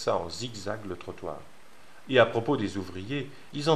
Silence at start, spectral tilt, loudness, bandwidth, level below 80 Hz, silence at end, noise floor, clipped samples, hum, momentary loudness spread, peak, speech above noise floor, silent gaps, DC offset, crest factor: 0 s; -5 dB/octave; -30 LUFS; 13.5 kHz; -64 dBFS; 0 s; -55 dBFS; under 0.1%; none; 16 LU; -6 dBFS; 26 dB; none; 0.6%; 24 dB